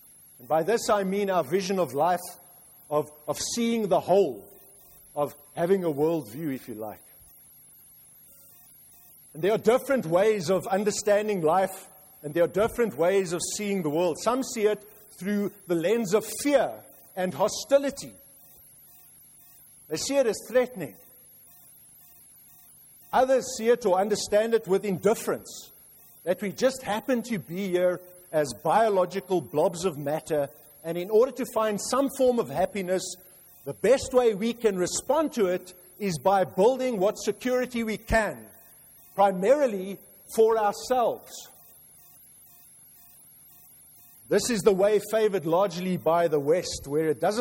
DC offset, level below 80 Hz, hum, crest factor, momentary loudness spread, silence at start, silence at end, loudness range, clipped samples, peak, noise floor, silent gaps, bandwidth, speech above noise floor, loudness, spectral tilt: under 0.1%; -56 dBFS; none; 20 dB; 12 LU; 0.4 s; 0 s; 6 LU; under 0.1%; -8 dBFS; -53 dBFS; none; 16.5 kHz; 28 dB; -26 LUFS; -4.5 dB/octave